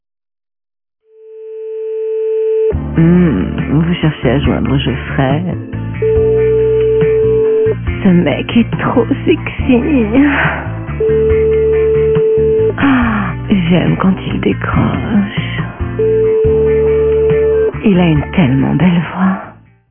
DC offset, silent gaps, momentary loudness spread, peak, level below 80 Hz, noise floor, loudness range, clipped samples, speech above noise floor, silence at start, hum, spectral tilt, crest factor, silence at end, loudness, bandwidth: under 0.1%; none; 7 LU; 0 dBFS; -28 dBFS; -33 dBFS; 2 LU; under 0.1%; 22 dB; 1.25 s; none; -12 dB/octave; 12 dB; 0.35 s; -12 LUFS; 3.6 kHz